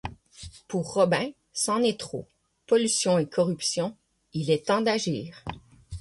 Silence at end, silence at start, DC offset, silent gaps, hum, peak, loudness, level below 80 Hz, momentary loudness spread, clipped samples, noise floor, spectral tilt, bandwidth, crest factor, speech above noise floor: 0 s; 0.05 s; under 0.1%; none; none; -10 dBFS; -26 LUFS; -54 dBFS; 17 LU; under 0.1%; -47 dBFS; -4 dB/octave; 12 kHz; 18 dB; 21 dB